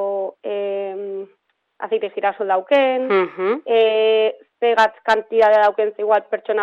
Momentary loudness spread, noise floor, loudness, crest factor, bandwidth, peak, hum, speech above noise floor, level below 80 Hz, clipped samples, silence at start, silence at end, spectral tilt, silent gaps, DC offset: 11 LU; -63 dBFS; -18 LUFS; 16 dB; 7.8 kHz; -2 dBFS; none; 46 dB; -66 dBFS; under 0.1%; 0 s; 0 s; -4.5 dB/octave; none; under 0.1%